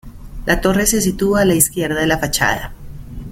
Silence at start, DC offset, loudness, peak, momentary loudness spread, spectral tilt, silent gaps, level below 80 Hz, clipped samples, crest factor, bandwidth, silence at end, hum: 0.05 s; under 0.1%; -16 LUFS; 0 dBFS; 14 LU; -3.5 dB/octave; none; -32 dBFS; under 0.1%; 18 dB; 17 kHz; 0 s; none